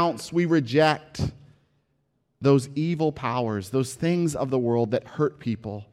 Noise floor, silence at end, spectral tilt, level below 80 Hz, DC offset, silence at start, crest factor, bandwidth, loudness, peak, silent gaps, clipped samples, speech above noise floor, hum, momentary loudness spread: -72 dBFS; 0.1 s; -6.5 dB/octave; -56 dBFS; under 0.1%; 0 s; 18 dB; 14 kHz; -25 LUFS; -6 dBFS; none; under 0.1%; 48 dB; none; 10 LU